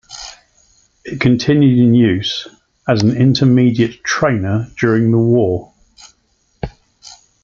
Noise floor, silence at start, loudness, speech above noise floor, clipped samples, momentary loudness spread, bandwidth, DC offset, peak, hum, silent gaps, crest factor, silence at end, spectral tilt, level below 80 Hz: -60 dBFS; 0.1 s; -14 LUFS; 48 dB; under 0.1%; 19 LU; 7.4 kHz; under 0.1%; -2 dBFS; none; none; 14 dB; 0.35 s; -6.5 dB/octave; -44 dBFS